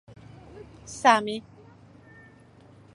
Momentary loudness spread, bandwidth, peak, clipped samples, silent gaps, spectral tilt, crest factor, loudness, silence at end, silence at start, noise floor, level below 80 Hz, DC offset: 27 LU; 11.5 kHz; -4 dBFS; under 0.1%; none; -3.5 dB/octave; 26 dB; -23 LUFS; 1.55 s; 0.55 s; -53 dBFS; -60 dBFS; under 0.1%